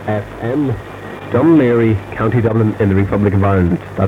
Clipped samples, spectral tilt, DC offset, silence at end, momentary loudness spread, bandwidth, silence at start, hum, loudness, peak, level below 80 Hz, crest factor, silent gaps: under 0.1%; -9.5 dB/octave; under 0.1%; 0 s; 10 LU; 7.2 kHz; 0 s; none; -14 LUFS; 0 dBFS; -38 dBFS; 14 dB; none